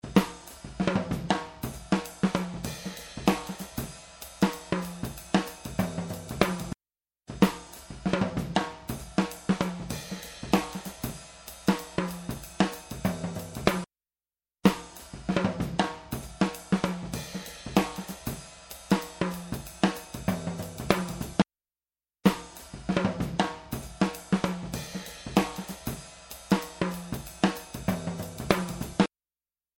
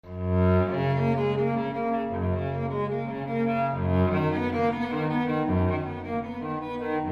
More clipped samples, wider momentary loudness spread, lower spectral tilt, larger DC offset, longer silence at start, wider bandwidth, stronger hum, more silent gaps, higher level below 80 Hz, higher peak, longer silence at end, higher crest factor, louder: neither; first, 11 LU vs 8 LU; second, -5.5 dB/octave vs -9.5 dB/octave; neither; about the same, 0.05 s vs 0.05 s; first, 17.5 kHz vs 6.4 kHz; neither; neither; second, -50 dBFS vs -40 dBFS; first, 0 dBFS vs -12 dBFS; first, 0.7 s vs 0 s; first, 30 dB vs 14 dB; second, -30 LUFS vs -27 LUFS